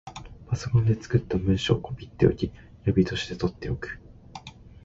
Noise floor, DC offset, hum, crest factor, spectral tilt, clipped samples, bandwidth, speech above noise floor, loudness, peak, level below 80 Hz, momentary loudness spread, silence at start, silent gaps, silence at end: -45 dBFS; under 0.1%; none; 20 dB; -7 dB/octave; under 0.1%; 7.8 kHz; 20 dB; -26 LUFS; -6 dBFS; -42 dBFS; 20 LU; 0.05 s; none; 0.1 s